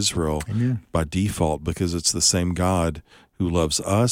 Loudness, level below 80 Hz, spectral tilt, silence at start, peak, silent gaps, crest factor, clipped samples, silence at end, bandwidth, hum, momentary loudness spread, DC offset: -22 LUFS; -38 dBFS; -4.5 dB/octave; 0 s; -6 dBFS; none; 16 dB; under 0.1%; 0 s; 16.5 kHz; none; 7 LU; under 0.1%